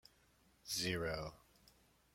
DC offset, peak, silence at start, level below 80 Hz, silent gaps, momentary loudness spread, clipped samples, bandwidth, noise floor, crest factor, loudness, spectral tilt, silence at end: under 0.1%; -26 dBFS; 0.65 s; -64 dBFS; none; 14 LU; under 0.1%; 16.5 kHz; -72 dBFS; 22 dB; -41 LUFS; -3 dB/octave; 0.8 s